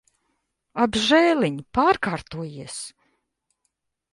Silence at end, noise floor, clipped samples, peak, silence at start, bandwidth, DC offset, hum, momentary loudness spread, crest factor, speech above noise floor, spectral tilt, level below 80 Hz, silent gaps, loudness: 1.25 s; -76 dBFS; under 0.1%; -4 dBFS; 0.75 s; 11.5 kHz; under 0.1%; none; 17 LU; 20 dB; 54 dB; -4.5 dB/octave; -54 dBFS; none; -21 LUFS